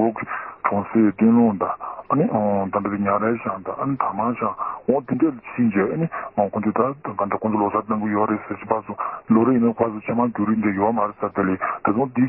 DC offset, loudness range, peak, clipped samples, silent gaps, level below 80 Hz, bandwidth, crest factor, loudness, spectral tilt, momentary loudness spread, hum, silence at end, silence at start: under 0.1%; 2 LU; -4 dBFS; under 0.1%; none; -56 dBFS; 3 kHz; 18 dB; -22 LUFS; -13.5 dB/octave; 8 LU; none; 0 s; 0 s